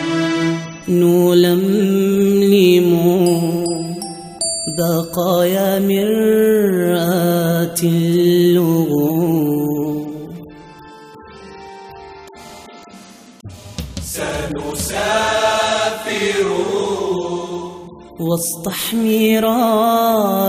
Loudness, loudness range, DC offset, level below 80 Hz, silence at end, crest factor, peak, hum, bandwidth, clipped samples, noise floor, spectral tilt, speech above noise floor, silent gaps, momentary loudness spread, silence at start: -16 LUFS; 15 LU; under 0.1%; -46 dBFS; 0 s; 16 dB; 0 dBFS; none; 16 kHz; under 0.1%; -40 dBFS; -5.5 dB/octave; 26 dB; none; 19 LU; 0 s